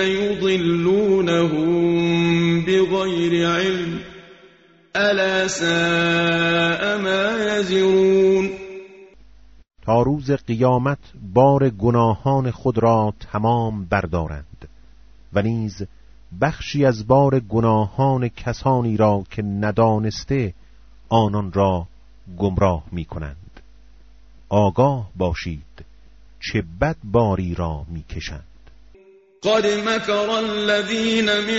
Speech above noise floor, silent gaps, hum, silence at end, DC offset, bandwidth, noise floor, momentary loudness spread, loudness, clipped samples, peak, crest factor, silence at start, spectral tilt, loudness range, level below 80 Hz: 32 dB; none; none; 0 s; under 0.1%; 8 kHz; -51 dBFS; 13 LU; -19 LUFS; under 0.1%; -2 dBFS; 18 dB; 0 s; -5 dB/octave; 6 LU; -42 dBFS